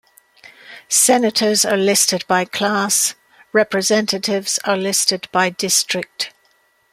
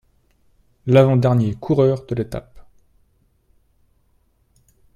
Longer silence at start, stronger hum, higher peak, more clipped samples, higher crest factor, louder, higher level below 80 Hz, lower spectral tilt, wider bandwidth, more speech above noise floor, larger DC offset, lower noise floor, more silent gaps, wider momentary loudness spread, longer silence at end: second, 0.7 s vs 0.85 s; neither; about the same, -2 dBFS vs 0 dBFS; neither; about the same, 18 dB vs 20 dB; about the same, -16 LUFS vs -18 LUFS; second, -66 dBFS vs -50 dBFS; second, -2 dB/octave vs -9 dB/octave; first, 16 kHz vs 9.4 kHz; about the same, 42 dB vs 45 dB; neither; about the same, -59 dBFS vs -61 dBFS; neither; second, 7 LU vs 16 LU; second, 0.65 s vs 2.35 s